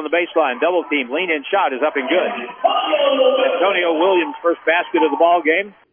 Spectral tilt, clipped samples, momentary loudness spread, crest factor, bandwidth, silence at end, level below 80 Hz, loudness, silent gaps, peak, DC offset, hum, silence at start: -7 dB/octave; under 0.1%; 5 LU; 14 dB; 3.6 kHz; 0.2 s; -72 dBFS; -17 LUFS; none; -2 dBFS; under 0.1%; none; 0 s